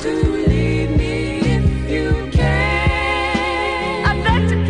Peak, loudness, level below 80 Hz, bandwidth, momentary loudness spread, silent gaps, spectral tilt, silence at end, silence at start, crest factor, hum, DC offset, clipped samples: -2 dBFS; -18 LUFS; -22 dBFS; 10.5 kHz; 3 LU; none; -6.5 dB/octave; 0 s; 0 s; 14 dB; none; under 0.1%; under 0.1%